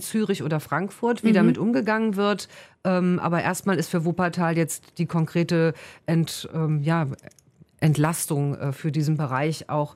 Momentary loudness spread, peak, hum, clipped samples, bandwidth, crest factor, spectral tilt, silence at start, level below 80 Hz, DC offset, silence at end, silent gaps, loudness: 7 LU; -8 dBFS; none; under 0.1%; 16 kHz; 16 dB; -6 dB/octave; 0 s; -62 dBFS; under 0.1%; 0.05 s; none; -24 LUFS